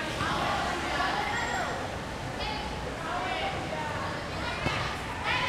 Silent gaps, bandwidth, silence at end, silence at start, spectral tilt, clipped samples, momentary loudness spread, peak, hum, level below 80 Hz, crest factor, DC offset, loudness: none; 16.5 kHz; 0 s; 0 s; -4 dB/octave; under 0.1%; 6 LU; -14 dBFS; none; -46 dBFS; 16 dB; under 0.1%; -31 LUFS